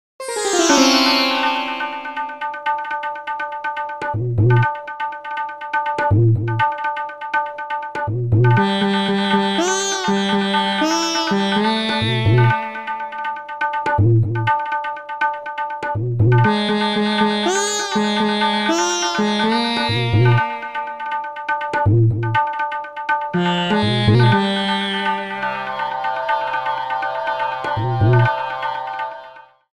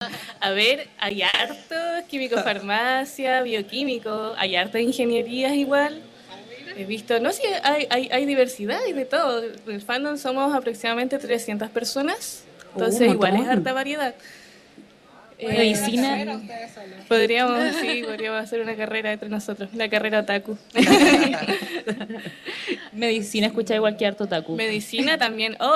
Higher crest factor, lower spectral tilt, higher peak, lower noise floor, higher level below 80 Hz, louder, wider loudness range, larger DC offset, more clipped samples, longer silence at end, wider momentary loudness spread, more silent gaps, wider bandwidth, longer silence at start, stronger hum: about the same, 18 dB vs 18 dB; first, -5 dB/octave vs -3.5 dB/octave; first, 0 dBFS vs -6 dBFS; second, -42 dBFS vs -50 dBFS; first, -48 dBFS vs -64 dBFS; first, -19 LUFS vs -23 LUFS; about the same, 4 LU vs 4 LU; neither; neither; first, 0.35 s vs 0 s; about the same, 11 LU vs 12 LU; neither; second, 13 kHz vs 15 kHz; first, 0.2 s vs 0 s; neither